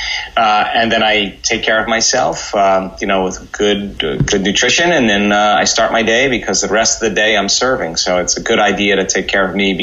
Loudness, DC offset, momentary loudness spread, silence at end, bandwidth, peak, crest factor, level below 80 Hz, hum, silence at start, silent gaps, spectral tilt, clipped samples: -13 LUFS; under 0.1%; 5 LU; 0 s; 8.2 kHz; -2 dBFS; 12 dB; -38 dBFS; none; 0 s; none; -2.5 dB/octave; under 0.1%